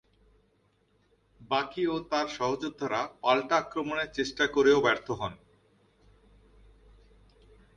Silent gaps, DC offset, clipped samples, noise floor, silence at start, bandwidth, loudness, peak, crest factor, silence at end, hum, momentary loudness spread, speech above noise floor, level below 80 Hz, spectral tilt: none; under 0.1%; under 0.1%; -69 dBFS; 1.4 s; 8.8 kHz; -29 LUFS; -10 dBFS; 22 dB; 2.4 s; none; 10 LU; 41 dB; -60 dBFS; -4.5 dB/octave